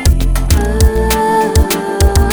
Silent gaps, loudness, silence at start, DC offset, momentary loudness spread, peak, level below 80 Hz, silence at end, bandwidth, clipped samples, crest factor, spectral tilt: none; -13 LUFS; 0 s; under 0.1%; 2 LU; 0 dBFS; -14 dBFS; 0 s; over 20 kHz; under 0.1%; 10 dB; -5 dB/octave